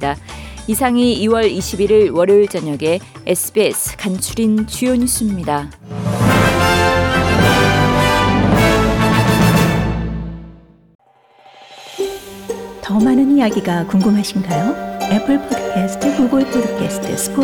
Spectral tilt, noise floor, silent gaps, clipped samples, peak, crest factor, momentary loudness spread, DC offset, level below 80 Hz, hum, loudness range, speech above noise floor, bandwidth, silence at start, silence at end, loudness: -5 dB/octave; -48 dBFS; 10.95-10.99 s; under 0.1%; -2 dBFS; 14 dB; 12 LU; under 0.1%; -32 dBFS; none; 6 LU; 32 dB; 19 kHz; 0 s; 0 s; -15 LUFS